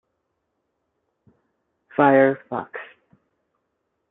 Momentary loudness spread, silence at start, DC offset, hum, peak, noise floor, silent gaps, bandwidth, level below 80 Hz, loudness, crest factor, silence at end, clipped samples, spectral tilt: 20 LU; 2 s; under 0.1%; none; -2 dBFS; -76 dBFS; none; 4 kHz; -74 dBFS; -20 LUFS; 22 dB; 1.25 s; under 0.1%; -11 dB/octave